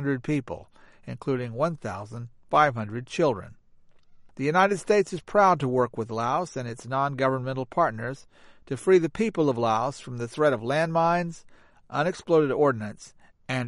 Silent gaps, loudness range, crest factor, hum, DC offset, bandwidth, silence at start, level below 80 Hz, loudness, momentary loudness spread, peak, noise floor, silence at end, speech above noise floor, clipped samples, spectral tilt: none; 3 LU; 20 dB; none; under 0.1%; 11.5 kHz; 0 s; -58 dBFS; -25 LUFS; 14 LU; -6 dBFS; -54 dBFS; 0 s; 29 dB; under 0.1%; -6.5 dB/octave